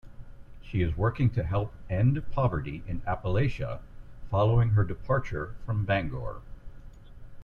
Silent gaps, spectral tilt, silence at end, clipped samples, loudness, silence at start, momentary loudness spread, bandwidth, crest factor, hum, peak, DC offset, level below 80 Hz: none; -9 dB/octave; 0 s; under 0.1%; -29 LUFS; 0.05 s; 12 LU; 6.4 kHz; 16 dB; none; -12 dBFS; under 0.1%; -40 dBFS